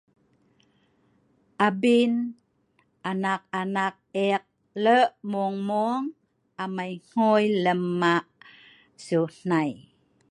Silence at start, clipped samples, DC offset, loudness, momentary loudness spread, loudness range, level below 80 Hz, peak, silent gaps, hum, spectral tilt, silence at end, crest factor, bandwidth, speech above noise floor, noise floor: 1.6 s; under 0.1%; under 0.1%; -25 LUFS; 12 LU; 2 LU; -76 dBFS; -6 dBFS; none; none; -6.5 dB/octave; 0.55 s; 20 dB; 11 kHz; 44 dB; -68 dBFS